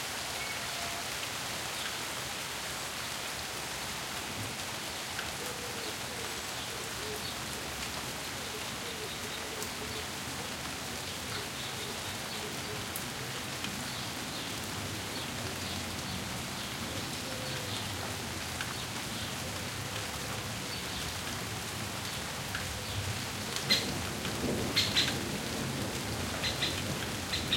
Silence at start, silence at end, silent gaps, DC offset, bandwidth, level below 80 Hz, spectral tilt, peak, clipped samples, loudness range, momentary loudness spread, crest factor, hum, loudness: 0 s; 0 s; none; under 0.1%; 16.5 kHz; -56 dBFS; -2.5 dB/octave; -12 dBFS; under 0.1%; 5 LU; 5 LU; 24 dB; none; -35 LUFS